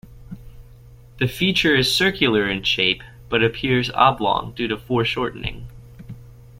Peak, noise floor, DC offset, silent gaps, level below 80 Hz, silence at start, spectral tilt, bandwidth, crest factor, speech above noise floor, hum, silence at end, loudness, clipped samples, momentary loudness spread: -2 dBFS; -45 dBFS; under 0.1%; none; -44 dBFS; 0.05 s; -4.5 dB/octave; 16.5 kHz; 20 dB; 25 dB; none; 0.3 s; -19 LUFS; under 0.1%; 24 LU